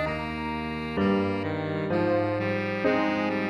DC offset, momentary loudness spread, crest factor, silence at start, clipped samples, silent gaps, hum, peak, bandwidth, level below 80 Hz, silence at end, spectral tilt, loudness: under 0.1%; 6 LU; 16 dB; 0 s; under 0.1%; none; none; -12 dBFS; 11 kHz; -50 dBFS; 0 s; -7.5 dB/octave; -27 LUFS